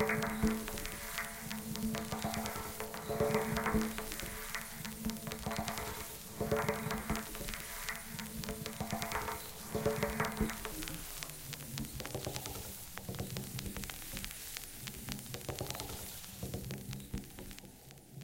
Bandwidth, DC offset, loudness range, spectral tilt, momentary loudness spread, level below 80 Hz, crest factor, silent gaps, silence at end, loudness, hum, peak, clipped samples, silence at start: 17 kHz; under 0.1%; 5 LU; -4 dB/octave; 10 LU; -52 dBFS; 24 dB; none; 0 s; -40 LUFS; none; -16 dBFS; under 0.1%; 0 s